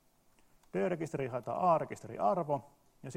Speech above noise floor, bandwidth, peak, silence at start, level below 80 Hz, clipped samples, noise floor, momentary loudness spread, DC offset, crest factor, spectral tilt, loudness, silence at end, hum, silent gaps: 34 dB; 15 kHz; -18 dBFS; 0.75 s; -72 dBFS; under 0.1%; -67 dBFS; 10 LU; under 0.1%; 18 dB; -7.5 dB/octave; -34 LUFS; 0 s; none; none